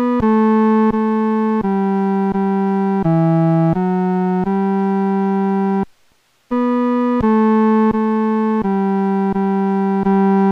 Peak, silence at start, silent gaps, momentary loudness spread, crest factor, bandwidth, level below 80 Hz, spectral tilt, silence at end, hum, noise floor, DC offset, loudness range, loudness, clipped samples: -6 dBFS; 0 s; none; 4 LU; 10 dB; 5 kHz; -46 dBFS; -10 dB/octave; 0 s; none; -57 dBFS; under 0.1%; 2 LU; -16 LUFS; under 0.1%